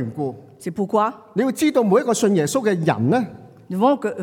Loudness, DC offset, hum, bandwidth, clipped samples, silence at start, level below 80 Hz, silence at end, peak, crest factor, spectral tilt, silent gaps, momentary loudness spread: -20 LUFS; under 0.1%; none; 17.5 kHz; under 0.1%; 0 s; -68 dBFS; 0 s; -6 dBFS; 14 dB; -6 dB/octave; none; 12 LU